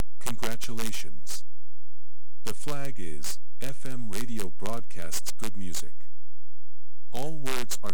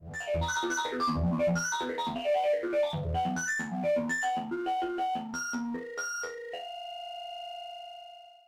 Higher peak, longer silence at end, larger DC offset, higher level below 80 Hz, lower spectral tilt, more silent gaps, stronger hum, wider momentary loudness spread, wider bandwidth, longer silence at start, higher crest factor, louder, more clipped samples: first, -12 dBFS vs -20 dBFS; second, 0 s vs 0.15 s; first, 20% vs under 0.1%; second, -64 dBFS vs -50 dBFS; about the same, -3.5 dB/octave vs -4 dB/octave; neither; neither; second, 7 LU vs 12 LU; first, over 20 kHz vs 16 kHz; first, 0.2 s vs 0 s; first, 28 dB vs 12 dB; second, -37 LUFS vs -32 LUFS; neither